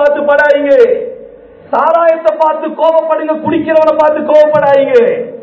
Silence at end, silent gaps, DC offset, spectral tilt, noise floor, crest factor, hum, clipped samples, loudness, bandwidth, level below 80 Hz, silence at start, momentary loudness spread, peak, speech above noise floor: 0 s; none; under 0.1%; -6.5 dB/octave; -34 dBFS; 10 dB; none; 2%; -9 LUFS; 8 kHz; -52 dBFS; 0 s; 6 LU; 0 dBFS; 25 dB